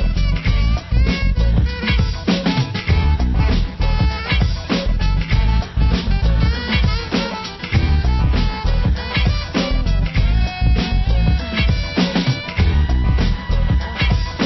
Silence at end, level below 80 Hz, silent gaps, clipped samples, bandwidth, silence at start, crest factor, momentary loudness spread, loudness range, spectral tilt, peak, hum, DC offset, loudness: 0 s; -18 dBFS; none; under 0.1%; 6 kHz; 0 s; 12 dB; 3 LU; 1 LU; -6.5 dB/octave; -4 dBFS; none; under 0.1%; -19 LUFS